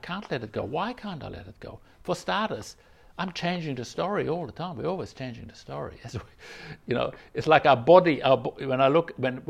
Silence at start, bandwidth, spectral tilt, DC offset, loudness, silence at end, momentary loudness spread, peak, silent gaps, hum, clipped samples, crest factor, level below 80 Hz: 0.05 s; 12 kHz; -6 dB/octave; under 0.1%; -25 LUFS; 0.05 s; 23 LU; -4 dBFS; none; none; under 0.1%; 24 dB; -56 dBFS